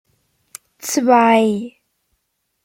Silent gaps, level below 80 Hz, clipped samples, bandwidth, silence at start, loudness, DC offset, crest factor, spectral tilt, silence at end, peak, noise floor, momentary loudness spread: none; -68 dBFS; under 0.1%; 16.5 kHz; 0.85 s; -15 LUFS; under 0.1%; 18 dB; -4 dB/octave; 0.95 s; -2 dBFS; -71 dBFS; 17 LU